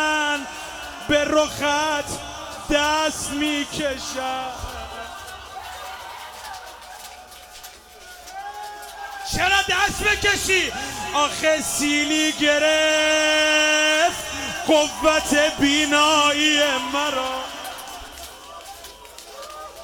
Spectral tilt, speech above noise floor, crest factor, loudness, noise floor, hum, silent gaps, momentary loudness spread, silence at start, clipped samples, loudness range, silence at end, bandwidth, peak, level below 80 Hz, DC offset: -1.5 dB/octave; 23 dB; 18 dB; -19 LUFS; -43 dBFS; none; none; 21 LU; 0 s; under 0.1%; 17 LU; 0 s; 19 kHz; -4 dBFS; -46 dBFS; under 0.1%